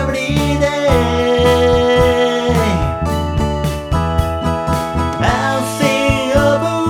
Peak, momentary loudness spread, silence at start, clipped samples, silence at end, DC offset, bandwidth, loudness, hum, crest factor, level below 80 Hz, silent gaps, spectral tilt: 0 dBFS; 6 LU; 0 s; under 0.1%; 0 s; under 0.1%; 19 kHz; -15 LUFS; none; 14 dB; -26 dBFS; none; -5.5 dB/octave